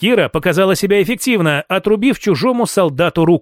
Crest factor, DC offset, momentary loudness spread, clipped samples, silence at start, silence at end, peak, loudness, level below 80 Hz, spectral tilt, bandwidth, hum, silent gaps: 12 dB; under 0.1%; 2 LU; under 0.1%; 0 s; 0 s; -2 dBFS; -14 LUFS; -46 dBFS; -5.5 dB/octave; 16.5 kHz; none; none